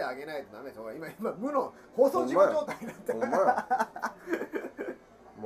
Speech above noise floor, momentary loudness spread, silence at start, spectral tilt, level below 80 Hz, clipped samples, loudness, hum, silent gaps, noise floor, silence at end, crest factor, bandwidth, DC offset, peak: 22 dB; 16 LU; 0 s; -5.5 dB/octave; -70 dBFS; under 0.1%; -30 LUFS; none; none; -51 dBFS; 0 s; 20 dB; 15.5 kHz; under 0.1%; -10 dBFS